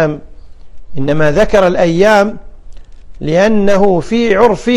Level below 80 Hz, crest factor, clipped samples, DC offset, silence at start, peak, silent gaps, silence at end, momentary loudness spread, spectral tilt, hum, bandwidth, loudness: -32 dBFS; 12 dB; 0.2%; under 0.1%; 0 s; 0 dBFS; none; 0 s; 11 LU; -6 dB/octave; none; 13.5 kHz; -11 LUFS